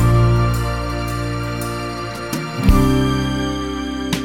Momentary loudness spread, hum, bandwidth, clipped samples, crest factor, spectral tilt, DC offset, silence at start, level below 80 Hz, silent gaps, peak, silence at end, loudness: 10 LU; none; 17 kHz; under 0.1%; 16 dB; -6 dB/octave; 0.2%; 0 s; -24 dBFS; none; -2 dBFS; 0 s; -19 LUFS